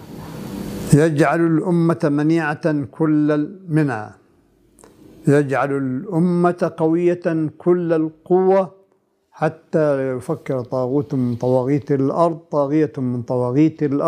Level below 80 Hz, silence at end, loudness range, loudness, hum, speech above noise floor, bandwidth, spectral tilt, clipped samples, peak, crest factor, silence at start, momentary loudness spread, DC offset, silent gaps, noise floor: -56 dBFS; 0 s; 3 LU; -19 LUFS; none; 44 dB; 15 kHz; -8 dB/octave; under 0.1%; -2 dBFS; 18 dB; 0 s; 8 LU; under 0.1%; none; -62 dBFS